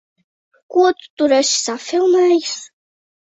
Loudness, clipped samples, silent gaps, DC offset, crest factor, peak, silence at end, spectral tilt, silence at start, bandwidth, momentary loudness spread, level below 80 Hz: -16 LUFS; under 0.1%; 1.10-1.17 s; under 0.1%; 16 dB; -2 dBFS; 0.6 s; -1 dB/octave; 0.7 s; 8.2 kHz; 7 LU; -66 dBFS